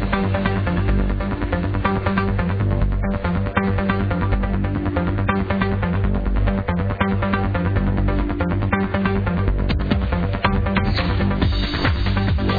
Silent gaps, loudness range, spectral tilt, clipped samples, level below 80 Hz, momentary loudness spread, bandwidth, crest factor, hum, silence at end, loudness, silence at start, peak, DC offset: none; 1 LU; -9 dB/octave; under 0.1%; -24 dBFS; 2 LU; 5 kHz; 16 dB; none; 0 s; -21 LUFS; 0 s; -4 dBFS; under 0.1%